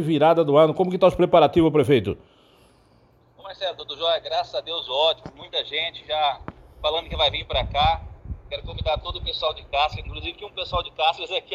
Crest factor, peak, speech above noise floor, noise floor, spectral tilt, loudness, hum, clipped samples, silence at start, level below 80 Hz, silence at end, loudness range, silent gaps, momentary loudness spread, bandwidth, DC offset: 20 dB; -4 dBFS; 35 dB; -57 dBFS; -6.5 dB/octave; -22 LUFS; none; under 0.1%; 0 s; -40 dBFS; 0 s; 6 LU; none; 15 LU; 13 kHz; under 0.1%